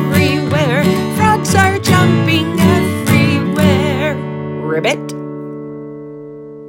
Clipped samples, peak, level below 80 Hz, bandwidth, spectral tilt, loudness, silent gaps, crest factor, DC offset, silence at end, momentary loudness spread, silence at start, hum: under 0.1%; 0 dBFS; -46 dBFS; 17 kHz; -5.5 dB/octave; -13 LUFS; none; 14 dB; under 0.1%; 0 s; 16 LU; 0 s; none